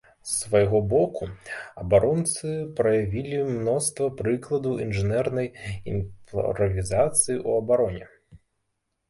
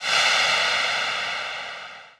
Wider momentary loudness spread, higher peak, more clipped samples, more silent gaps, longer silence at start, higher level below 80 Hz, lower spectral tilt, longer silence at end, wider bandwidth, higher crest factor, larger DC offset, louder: second, 11 LU vs 15 LU; about the same, -6 dBFS vs -8 dBFS; neither; neither; first, 0.25 s vs 0 s; first, -46 dBFS vs -64 dBFS; first, -5.5 dB/octave vs 1 dB/octave; first, 0.75 s vs 0.1 s; second, 12 kHz vs 16.5 kHz; about the same, 18 dB vs 16 dB; neither; second, -25 LUFS vs -21 LUFS